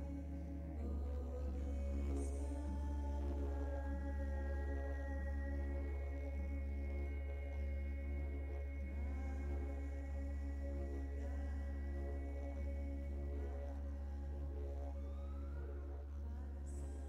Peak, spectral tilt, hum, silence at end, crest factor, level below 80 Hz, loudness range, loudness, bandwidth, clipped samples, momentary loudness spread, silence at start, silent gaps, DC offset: -32 dBFS; -8.5 dB/octave; none; 0 s; 12 dB; -44 dBFS; 3 LU; -45 LUFS; 9.4 kHz; under 0.1%; 4 LU; 0 s; none; under 0.1%